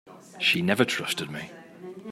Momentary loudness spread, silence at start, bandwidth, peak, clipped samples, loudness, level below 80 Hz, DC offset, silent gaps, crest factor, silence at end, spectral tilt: 20 LU; 0.05 s; 16 kHz; -6 dBFS; under 0.1%; -25 LUFS; -70 dBFS; under 0.1%; none; 24 dB; 0 s; -4 dB/octave